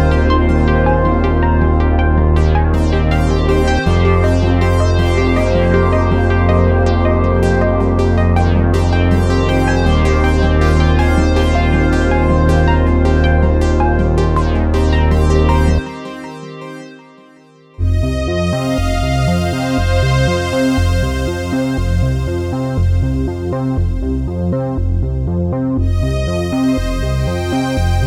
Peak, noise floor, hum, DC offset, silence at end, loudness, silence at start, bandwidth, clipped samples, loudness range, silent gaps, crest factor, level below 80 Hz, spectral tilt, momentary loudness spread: 0 dBFS; -44 dBFS; none; under 0.1%; 0 s; -14 LUFS; 0 s; 11 kHz; under 0.1%; 5 LU; none; 12 dB; -20 dBFS; -7 dB/octave; 6 LU